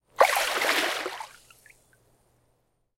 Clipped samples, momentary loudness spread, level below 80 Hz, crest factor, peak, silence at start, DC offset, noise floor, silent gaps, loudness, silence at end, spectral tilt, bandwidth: under 0.1%; 18 LU; -68 dBFS; 26 dB; -2 dBFS; 0.2 s; under 0.1%; -71 dBFS; none; -24 LUFS; 1.7 s; 0 dB/octave; 16.5 kHz